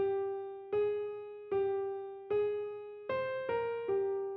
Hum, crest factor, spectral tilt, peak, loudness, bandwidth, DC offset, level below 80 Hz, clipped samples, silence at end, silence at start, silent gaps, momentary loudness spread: none; 12 dB; -4.5 dB/octave; -24 dBFS; -36 LUFS; 4.5 kHz; under 0.1%; -72 dBFS; under 0.1%; 0 s; 0 s; none; 9 LU